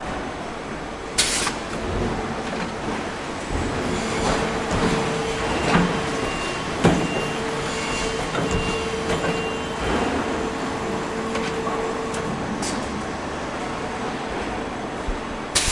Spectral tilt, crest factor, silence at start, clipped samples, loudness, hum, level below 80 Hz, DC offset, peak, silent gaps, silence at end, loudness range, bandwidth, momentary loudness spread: -4 dB/octave; 22 dB; 0 s; under 0.1%; -24 LUFS; none; -38 dBFS; under 0.1%; -2 dBFS; none; 0 s; 4 LU; 11.5 kHz; 9 LU